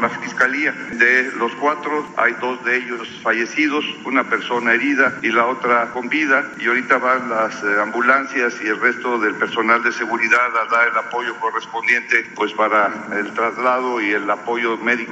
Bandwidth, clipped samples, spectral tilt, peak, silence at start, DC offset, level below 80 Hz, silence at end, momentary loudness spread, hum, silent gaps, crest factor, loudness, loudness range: 8.4 kHz; under 0.1%; -3.5 dB/octave; -2 dBFS; 0 s; under 0.1%; -68 dBFS; 0 s; 6 LU; none; none; 16 dB; -18 LUFS; 2 LU